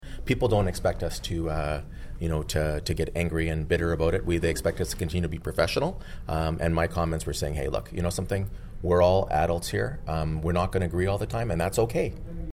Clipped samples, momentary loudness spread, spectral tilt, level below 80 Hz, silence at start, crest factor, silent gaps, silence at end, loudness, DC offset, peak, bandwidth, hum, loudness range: under 0.1%; 7 LU; -6 dB/octave; -36 dBFS; 0 s; 16 dB; none; 0 s; -27 LUFS; under 0.1%; -10 dBFS; 16 kHz; none; 2 LU